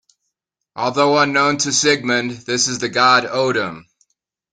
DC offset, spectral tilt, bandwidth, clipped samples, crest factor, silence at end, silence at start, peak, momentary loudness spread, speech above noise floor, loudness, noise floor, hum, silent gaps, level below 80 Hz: under 0.1%; -2.5 dB/octave; 10 kHz; under 0.1%; 18 dB; 0.7 s; 0.75 s; 0 dBFS; 9 LU; 60 dB; -16 LUFS; -77 dBFS; none; none; -60 dBFS